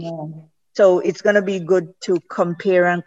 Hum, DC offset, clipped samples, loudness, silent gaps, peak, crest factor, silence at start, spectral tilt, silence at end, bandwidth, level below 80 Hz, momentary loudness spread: none; under 0.1%; under 0.1%; -18 LUFS; none; -2 dBFS; 16 dB; 0 s; -6.5 dB/octave; 0.05 s; 8 kHz; -70 dBFS; 15 LU